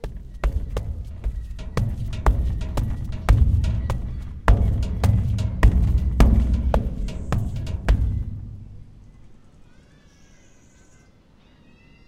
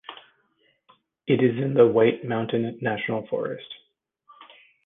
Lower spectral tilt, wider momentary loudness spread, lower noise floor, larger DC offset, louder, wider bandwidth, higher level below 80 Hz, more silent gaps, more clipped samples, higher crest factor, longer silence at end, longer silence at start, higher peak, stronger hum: second, -7.5 dB/octave vs -10 dB/octave; second, 14 LU vs 21 LU; second, -53 dBFS vs -67 dBFS; neither; about the same, -24 LUFS vs -23 LUFS; first, 10 kHz vs 3.9 kHz; first, -24 dBFS vs -68 dBFS; neither; neither; about the same, 22 dB vs 20 dB; first, 2.75 s vs 1.1 s; about the same, 0.05 s vs 0.1 s; first, 0 dBFS vs -4 dBFS; neither